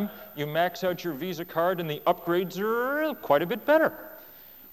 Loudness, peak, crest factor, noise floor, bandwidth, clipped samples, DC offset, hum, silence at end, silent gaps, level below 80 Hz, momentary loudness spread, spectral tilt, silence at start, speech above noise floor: -27 LUFS; -8 dBFS; 18 dB; -49 dBFS; 16.5 kHz; under 0.1%; under 0.1%; none; 0 s; none; -68 dBFS; 17 LU; -6 dB/octave; 0 s; 22 dB